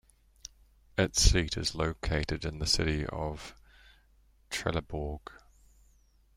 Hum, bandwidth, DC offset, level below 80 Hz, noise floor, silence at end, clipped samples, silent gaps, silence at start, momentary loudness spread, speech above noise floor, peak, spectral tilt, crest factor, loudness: none; 16 kHz; under 0.1%; -38 dBFS; -64 dBFS; 1.05 s; under 0.1%; none; 0.45 s; 24 LU; 34 dB; -8 dBFS; -3.5 dB/octave; 26 dB; -31 LUFS